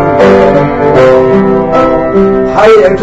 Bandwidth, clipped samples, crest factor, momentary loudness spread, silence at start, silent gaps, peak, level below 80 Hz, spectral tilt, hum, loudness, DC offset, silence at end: 8 kHz; 6%; 6 dB; 4 LU; 0 s; none; 0 dBFS; -28 dBFS; -7.5 dB/octave; none; -6 LUFS; under 0.1%; 0 s